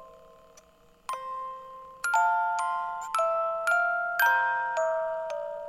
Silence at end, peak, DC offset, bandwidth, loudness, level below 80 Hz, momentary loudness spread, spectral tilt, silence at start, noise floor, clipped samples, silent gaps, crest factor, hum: 0 s; -12 dBFS; under 0.1%; 16.5 kHz; -28 LUFS; -68 dBFS; 14 LU; 0 dB/octave; 0 s; -59 dBFS; under 0.1%; none; 16 dB; none